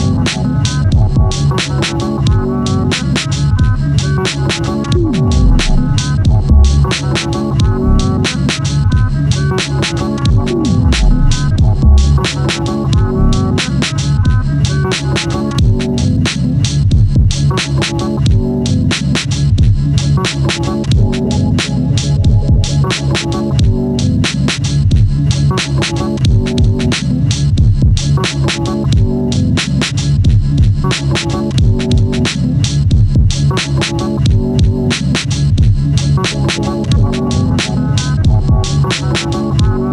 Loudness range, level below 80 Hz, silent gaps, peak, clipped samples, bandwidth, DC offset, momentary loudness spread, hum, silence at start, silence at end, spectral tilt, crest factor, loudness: 1 LU; -18 dBFS; none; 0 dBFS; under 0.1%; 11 kHz; under 0.1%; 3 LU; none; 0 s; 0 s; -5.5 dB/octave; 12 dB; -13 LUFS